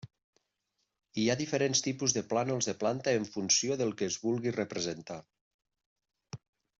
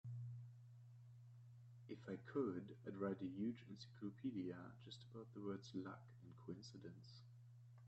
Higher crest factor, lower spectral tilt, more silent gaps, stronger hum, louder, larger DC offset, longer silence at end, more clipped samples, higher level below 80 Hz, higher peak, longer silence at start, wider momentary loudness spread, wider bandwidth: about the same, 20 dB vs 20 dB; second, -3.5 dB/octave vs -7.5 dB/octave; first, 0.24-0.33 s, 5.41-5.59 s, 5.86-5.96 s vs none; neither; first, -31 LUFS vs -52 LUFS; neither; first, 0.4 s vs 0 s; neither; first, -72 dBFS vs -86 dBFS; first, -12 dBFS vs -32 dBFS; about the same, 0.05 s vs 0.05 s; about the same, 18 LU vs 17 LU; about the same, 8.2 kHz vs 8.2 kHz